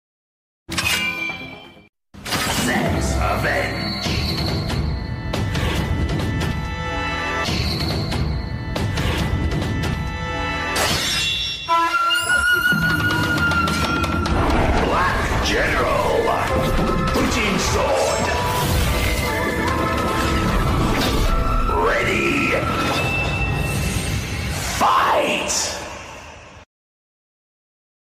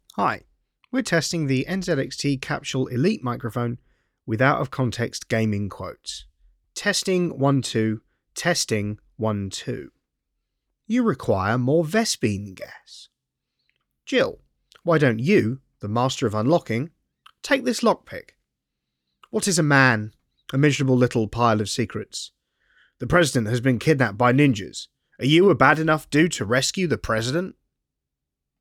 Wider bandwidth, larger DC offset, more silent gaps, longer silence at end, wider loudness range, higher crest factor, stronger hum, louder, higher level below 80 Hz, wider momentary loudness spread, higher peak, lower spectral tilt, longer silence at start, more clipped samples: about the same, 15.5 kHz vs 16 kHz; neither; first, 1.89-1.93 s vs none; first, 1.4 s vs 1.1 s; about the same, 5 LU vs 6 LU; second, 14 dB vs 22 dB; neither; about the same, -20 LUFS vs -22 LUFS; first, -28 dBFS vs -54 dBFS; second, 7 LU vs 16 LU; second, -6 dBFS vs -2 dBFS; about the same, -4 dB/octave vs -5 dB/octave; first, 0.7 s vs 0.15 s; neither